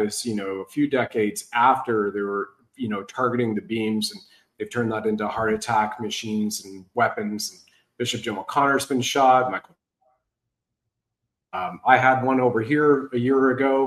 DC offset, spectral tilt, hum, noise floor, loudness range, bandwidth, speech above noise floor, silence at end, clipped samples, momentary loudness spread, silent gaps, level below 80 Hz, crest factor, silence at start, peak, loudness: under 0.1%; -4.5 dB/octave; none; -82 dBFS; 4 LU; 13 kHz; 60 dB; 0 s; under 0.1%; 12 LU; none; -64 dBFS; 20 dB; 0 s; -2 dBFS; -23 LUFS